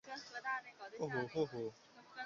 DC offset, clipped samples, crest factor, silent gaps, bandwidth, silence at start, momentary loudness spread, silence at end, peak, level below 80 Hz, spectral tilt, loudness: under 0.1%; under 0.1%; 18 dB; none; 7.4 kHz; 0.05 s; 13 LU; 0 s; -26 dBFS; -80 dBFS; -4 dB/octave; -43 LUFS